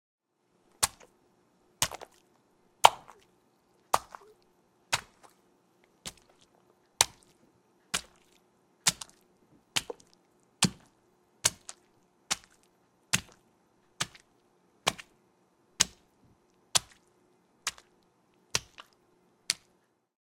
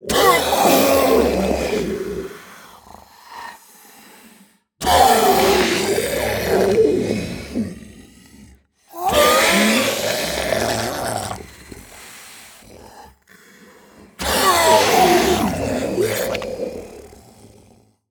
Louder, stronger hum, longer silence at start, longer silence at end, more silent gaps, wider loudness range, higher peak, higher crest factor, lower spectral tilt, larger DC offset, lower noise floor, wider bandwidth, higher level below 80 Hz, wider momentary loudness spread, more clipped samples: second, -31 LUFS vs -17 LUFS; neither; first, 0.8 s vs 0.05 s; second, 0.75 s vs 1.05 s; neither; second, 7 LU vs 10 LU; about the same, 0 dBFS vs 0 dBFS; first, 36 dB vs 18 dB; second, -1 dB/octave vs -3 dB/octave; neither; first, -72 dBFS vs -52 dBFS; second, 16.5 kHz vs over 20 kHz; second, -66 dBFS vs -42 dBFS; second, 20 LU vs 24 LU; neither